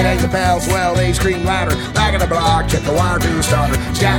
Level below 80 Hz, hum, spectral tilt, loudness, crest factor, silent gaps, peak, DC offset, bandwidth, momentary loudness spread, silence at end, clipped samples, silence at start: -24 dBFS; none; -5 dB/octave; -16 LUFS; 14 dB; none; -2 dBFS; under 0.1%; 19 kHz; 2 LU; 0 s; under 0.1%; 0 s